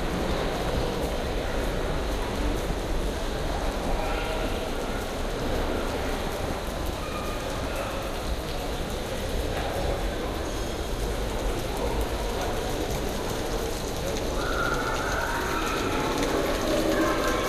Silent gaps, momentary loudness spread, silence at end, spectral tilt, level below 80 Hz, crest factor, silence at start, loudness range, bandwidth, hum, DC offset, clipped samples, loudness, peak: none; 5 LU; 0 s; -4.5 dB/octave; -32 dBFS; 16 dB; 0 s; 3 LU; 15.5 kHz; none; under 0.1%; under 0.1%; -29 LUFS; -12 dBFS